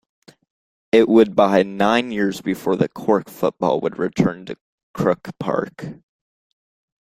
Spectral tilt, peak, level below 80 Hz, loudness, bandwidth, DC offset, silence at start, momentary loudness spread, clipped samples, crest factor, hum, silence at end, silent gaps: -6.5 dB/octave; 0 dBFS; -56 dBFS; -19 LUFS; 16 kHz; under 0.1%; 0.95 s; 19 LU; under 0.1%; 20 dB; none; 1.1 s; 4.61-4.94 s